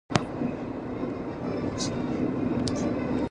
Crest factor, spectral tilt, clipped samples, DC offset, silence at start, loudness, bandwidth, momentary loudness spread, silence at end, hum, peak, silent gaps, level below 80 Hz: 26 dB; -5.5 dB/octave; under 0.1%; under 0.1%; 0.1 s; -30 LUFS; 10.5 kHz; 5 LU; 0 s; none; -2 dBFS; none; -48 dBFS